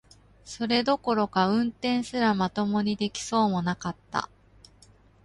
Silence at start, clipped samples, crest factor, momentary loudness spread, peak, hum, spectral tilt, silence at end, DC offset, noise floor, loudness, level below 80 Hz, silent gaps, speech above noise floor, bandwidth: 0.45 s; under 0.1%; 18 dB; 8 LU; -8 dBFS; none; -5 dB/octave; 1 s; under 0.1%; -57 dBFS; -26 LUFS; -58 dBFS; none; 31 dB; 11.5 kHz